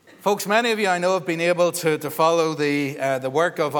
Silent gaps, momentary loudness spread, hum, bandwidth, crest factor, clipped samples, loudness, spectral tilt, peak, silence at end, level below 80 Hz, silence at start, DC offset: none; 5 LU; none; 20 kHz; 18 dB; under 0.1%; -21 LUFS; -4 dB/octave; -4 dBFS; 0 s; -76 dBFS; 0.25 s; under 0.1%